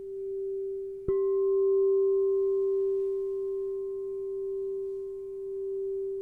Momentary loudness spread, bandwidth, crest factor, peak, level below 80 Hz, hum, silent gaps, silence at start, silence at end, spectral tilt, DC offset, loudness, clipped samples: 11 LU; 2.1 kHz; 12 dB; -18 dBFS; -60 dBFS; none; none; 0 s; 0 s; -10 dB/octave; under 0.1%; -30 LUFS; under 0.1%